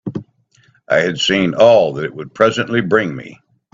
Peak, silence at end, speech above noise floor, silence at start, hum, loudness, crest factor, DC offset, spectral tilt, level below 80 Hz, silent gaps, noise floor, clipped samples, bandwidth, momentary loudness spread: 0 dBFS; 0.4 s; 40 dB; 0.05 s; none; -15 LUFS; 16 dB; under 0.1%; -5 dB/octave; -54 dBFS; none; -55 dBFS; under 0.1%; 7.6 kHz; 16 LU